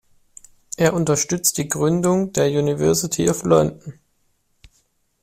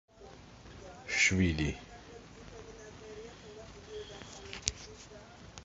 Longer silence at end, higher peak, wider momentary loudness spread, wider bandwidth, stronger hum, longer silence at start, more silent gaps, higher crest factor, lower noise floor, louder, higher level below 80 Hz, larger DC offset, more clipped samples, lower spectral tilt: first, 1.3 s vs 0 s; about the same, -4 dBFS vs -6 dBFS; second, 6 LU vs 24 LU; first, 16 kHz vs 7.6 kHz; neither; first, 0.8 s vs 0.2 s; neither; second, 18 dB vs 32 dB; first, -65 dBFS vs -53 dBFS; first, -19 LUFS vs -32 LUFS; about the same, -50 dBFS vs -50 dBFS; neither; neither; about the same, -5 dB/octave vs -4 dB/octave